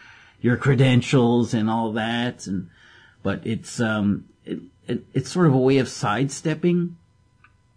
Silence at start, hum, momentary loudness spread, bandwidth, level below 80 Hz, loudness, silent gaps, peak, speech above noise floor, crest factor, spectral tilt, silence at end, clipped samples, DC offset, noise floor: 0.45 s; none; 13 LU; 10.5 kHz; -56 dBFS; -22 LUFS; none; -6 dBFS; 36 dB; 16 dB; -6.5 dB/octave; 0.8 s; under 0.1%; under 0.1%; -58 dBFS